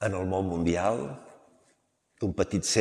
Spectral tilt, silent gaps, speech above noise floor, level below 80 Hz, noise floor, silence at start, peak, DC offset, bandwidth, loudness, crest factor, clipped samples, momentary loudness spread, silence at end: -4.5 dB/octave; none; 42 dB; -56 dBFS; -70 dBFS; 0 s; -8 dBFS; under 0.1%; 14 kHz; -29 LUFS; 22 dB; under 0.1%; 10 LU; 0 s